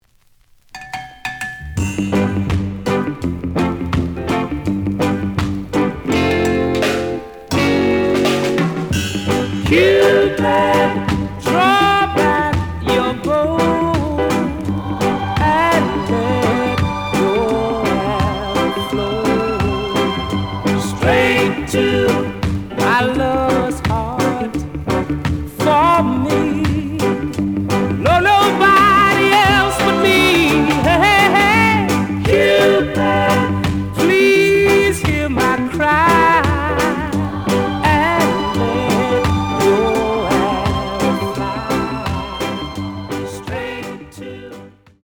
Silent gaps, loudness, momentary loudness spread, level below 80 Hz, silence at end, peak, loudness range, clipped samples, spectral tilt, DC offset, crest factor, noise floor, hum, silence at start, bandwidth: none; -15 LUFS; 11 LU; -36 dBFS; 0.35 s; -2 dBFS; 7 LU; under 0.1%; -5.5 dB/octave; under 0.1%; 14 dB; -53 dBFS; none; 0.75 s; over 20 kHz